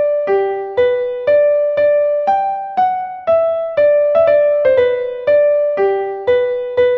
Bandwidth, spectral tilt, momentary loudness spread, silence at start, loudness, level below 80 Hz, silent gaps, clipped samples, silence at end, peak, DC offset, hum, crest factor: 4.8 kHz; -6.5 dB/octave; 6 LU; 0 s; -14 LUFS; -54 dBFS; none; under 0.1%; 0 s; -2 dBFS; under 0.1%; none; 12 dB